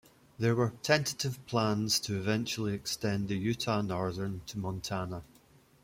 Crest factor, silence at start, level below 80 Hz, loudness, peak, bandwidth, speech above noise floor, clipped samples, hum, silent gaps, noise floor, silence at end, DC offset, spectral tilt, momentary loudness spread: 20 dB; 0.4 s; -62 dBFS; -32 LUFS; -12 dBFS; 16.5 kHz; 30 dB; under 0.1%; none; none; -62 dBFS; 0.6 s; under 0.1%; -4.5 dB/octave; 9 LU